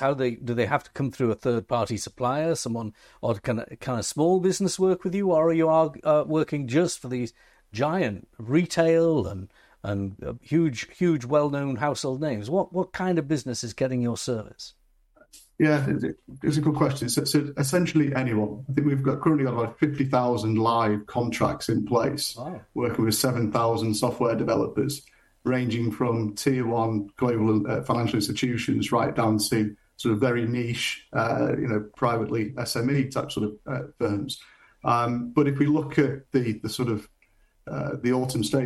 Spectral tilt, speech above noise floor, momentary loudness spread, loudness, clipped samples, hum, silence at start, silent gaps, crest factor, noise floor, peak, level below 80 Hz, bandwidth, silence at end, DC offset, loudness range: -6 dB/octave; 38 dB; 8 LU; -25 LUFS; under 0.1%; none; 0 s; none; 18 dB; -62 dBFS; -8 dBFS; -56 dBFS; 13.5 kHz; 0 s; under 0.1%; 3 LU